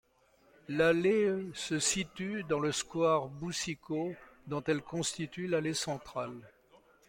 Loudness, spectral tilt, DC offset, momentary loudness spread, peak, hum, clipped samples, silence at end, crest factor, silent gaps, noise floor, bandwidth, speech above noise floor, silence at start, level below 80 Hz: -33 LUFS; -4 dB/octave; under 0.1%; 12 LU; -14 dBFS; none; under 0.1%; 0.6 s; 20 dB; none; -67 dBFS; 16.5 kHz; 34 dB; 0.7 s; -66 dBFS